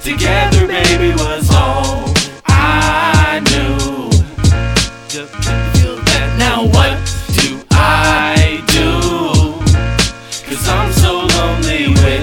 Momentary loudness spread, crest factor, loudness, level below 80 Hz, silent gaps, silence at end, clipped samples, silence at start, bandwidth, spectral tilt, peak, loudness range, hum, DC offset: 6 LU; 12 dB; -12 LUFS; -20 dBFS; none; 0 s; under 0.1%; 0 s; 17.5 kHz; -4.5 dB/octave; 0 dBFS; 2 LU; none; under 0.1%